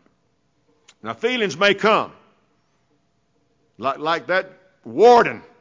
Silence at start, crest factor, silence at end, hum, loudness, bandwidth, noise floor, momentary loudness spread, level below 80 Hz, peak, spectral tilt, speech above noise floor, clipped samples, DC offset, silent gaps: 1.05 s; 18 dB; 0.2 s; none; -18 LUFS; 7.6 kHz; -67 dBFS; 20 LU; -64 dBFS; -4 dBFS; -4 dB/octave; 48 dB; under 0.1%; under 0.1%; none